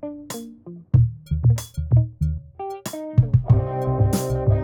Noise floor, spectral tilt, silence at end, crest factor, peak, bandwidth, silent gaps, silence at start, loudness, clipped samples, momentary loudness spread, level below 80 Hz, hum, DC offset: -40 dBFS; -7.5 dB/octave; 0 s; 16 dB; -4 dBFS; 18.5 kHz; none; 0 s; -22 LUFS; under 0.1%; 14 LU; -32 dBFS; none; under 0.1%